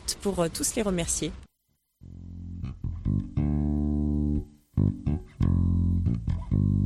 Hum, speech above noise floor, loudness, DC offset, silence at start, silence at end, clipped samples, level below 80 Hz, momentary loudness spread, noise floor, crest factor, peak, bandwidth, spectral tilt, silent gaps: none; 46 dB; -28 LUFS; under 0.1%; 0 s; 0 s; under 0.1%; -36 dBFS; 12 LU; -74 dBFS; 16 dB; -12 dBFS; 14.5 kHz; -6 dB/octave; none